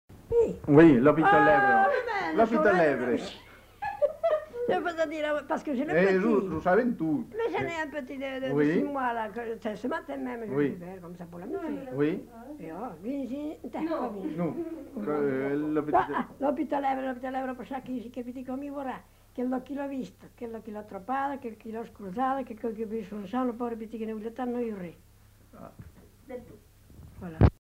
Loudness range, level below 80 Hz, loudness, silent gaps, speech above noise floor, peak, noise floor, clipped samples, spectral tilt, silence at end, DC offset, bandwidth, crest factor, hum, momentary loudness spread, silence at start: 11 LU; -48 dBFS; -28 LUFS; none; 27 dB; -6 dBFS; -55 dBFS; under 0.1%; -7.5 dB/octave; 0.1 s; under 0.1%; 16 kHz; 22 dB; none; 18 LU; 0.1 s